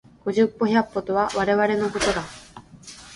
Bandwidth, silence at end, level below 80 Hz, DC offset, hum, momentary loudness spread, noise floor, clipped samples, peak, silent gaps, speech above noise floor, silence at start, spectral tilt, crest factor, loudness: 11.5 kHz; 0 s; -50 dBFS; under 0.1%; none; 21 LU; -45 dBFS; under 0.1%; -6 dBFS; none; 23 dB; 0.25 s; -4.5 dB/octave; 18 dB; -22 LUFS